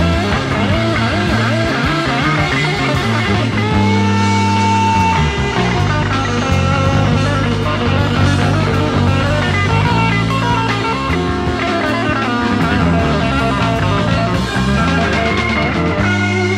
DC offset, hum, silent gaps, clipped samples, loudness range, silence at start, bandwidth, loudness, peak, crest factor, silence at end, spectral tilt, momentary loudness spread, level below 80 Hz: under 0.1%; none; none; under 0.1%; 1 LU; 0 s; 12.5 kHz; -14 LUFS; 0 dBFS; 14 dB; 0 s; -6 dB/octave; 3 LU; -28 dBFS